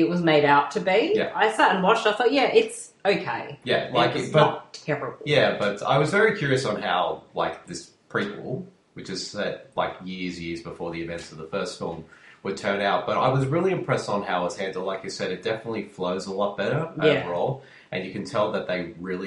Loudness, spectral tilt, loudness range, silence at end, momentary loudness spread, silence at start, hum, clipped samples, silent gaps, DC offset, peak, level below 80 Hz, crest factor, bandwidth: -24 LUFS; -5 dB/octave; 10 LU; 0 s; 14 LU; 0 s; none; under 0.1%; none; under 0.1%; -4 dBFS; -60 dBFS; 20 dB; 11.5 kHz